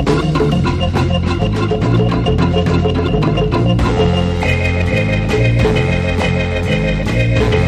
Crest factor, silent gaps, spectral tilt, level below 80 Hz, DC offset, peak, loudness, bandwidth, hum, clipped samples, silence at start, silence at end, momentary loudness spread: 12 dB; none; -7 dB/octave; -24 dBFS; under 0.1%; -2 dBFS; -15 LUFS; 10 kHz; none; under 0.1%; 0 s; 0 s; 2 LU